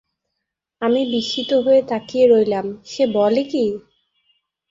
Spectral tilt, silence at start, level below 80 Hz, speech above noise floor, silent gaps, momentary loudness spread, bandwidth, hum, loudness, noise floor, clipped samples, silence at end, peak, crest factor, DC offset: -5.5 dB/octave; 0.8 s; -60 dBFS; 62 dB; none; 10 LU; 7.6 kHz; none; -18 LUFS; -80 dBFS; under 0.1%; 0.9 s; -4 dBFS; 16 dB; under 0.1%